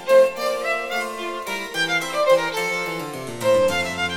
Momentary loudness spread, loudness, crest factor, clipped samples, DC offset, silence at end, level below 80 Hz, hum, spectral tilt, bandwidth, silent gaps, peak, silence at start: 9 LU; -21 LUFS; 16 dB; under 0.1%; under 0.1%; 0 s; -58 dBFS; none; -3 dB/octave; 17 kHz; none; -6 dBFS; 0 s